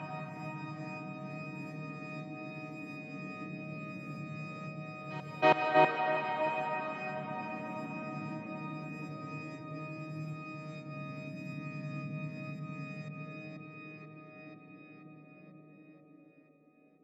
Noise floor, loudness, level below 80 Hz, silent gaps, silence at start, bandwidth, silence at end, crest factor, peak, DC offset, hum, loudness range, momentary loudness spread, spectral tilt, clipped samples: -65 dBFS; -37 LUFS; -84 dBFS; none; 0 s; 8 kHz; 0.65 s; 26 dB; -12 dBFS; under 0.1%; none; 15 LU; 19 LU; -7 dB/octave; under 0.1%